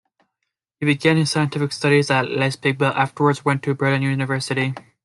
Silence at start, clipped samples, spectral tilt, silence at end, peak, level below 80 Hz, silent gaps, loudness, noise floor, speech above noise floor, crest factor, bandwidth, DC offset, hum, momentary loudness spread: 0.8 s; under 0.1%; -5.5 dB/octave; 0.25 s; -2 dBFS; -62 dBFS; none; -20 LUFS; -79 dBFS; 59 dB; 18 dB; 12 kHz; under 0.1%; none; 5 LU